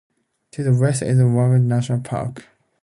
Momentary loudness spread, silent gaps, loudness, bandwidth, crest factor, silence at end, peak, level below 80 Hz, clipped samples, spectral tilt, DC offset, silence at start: 11 LU; none; -19 LUFS; 11 kHz; 14 dB; 0.4 s; -6 dBFS; -54 dBFS; under 0.1%; -7.5 dB/octave; under 0.1%; 0.6 s